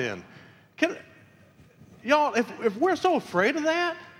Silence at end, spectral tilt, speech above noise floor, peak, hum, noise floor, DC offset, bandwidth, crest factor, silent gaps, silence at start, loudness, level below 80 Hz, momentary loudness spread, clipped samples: 0.1 s; -4.5 dB/octave; 31 dB; -6 dBFS; none; -55 dBFS; under 0.1%; 15.5 kHz; 22 dB; none; 0 s; -25 LUFS; -72 dBFS; 12 LU; under 0.1%